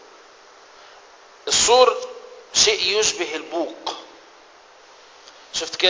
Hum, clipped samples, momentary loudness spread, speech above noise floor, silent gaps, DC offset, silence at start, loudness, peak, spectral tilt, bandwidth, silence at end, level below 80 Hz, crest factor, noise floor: none; under 0.1%; 20 LU; 30 dB; none; under 0.1%; 1.45 s; -19 LUFS; 0 dBFS; 0 dB/octave; 8 kHz; 0 s; -56 dBFS; 22 dB; -49 dBFS